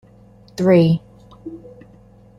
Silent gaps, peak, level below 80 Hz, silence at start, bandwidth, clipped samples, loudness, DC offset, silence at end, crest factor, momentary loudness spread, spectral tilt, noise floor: none; -4 dBFS; -52 dBFS; 0.6 s; 11.5 kHz; under 0.1%; -16 LUFS; under 0.1%; 0.8 s; 18 dB; 24 LU; -8.5 dB/octave; -47 dBFS